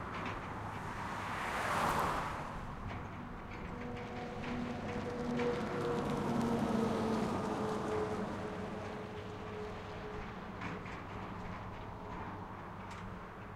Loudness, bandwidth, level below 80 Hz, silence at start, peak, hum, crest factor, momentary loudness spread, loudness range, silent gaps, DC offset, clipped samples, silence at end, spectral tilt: -40 LUFS; 16 kHz; -54 dBFS; 0 s; -22 dBFS; none; 18 dB; 12 LU; 9 LU; none; under 0.1%; under 0.1%; 0 s; -6 dB/octave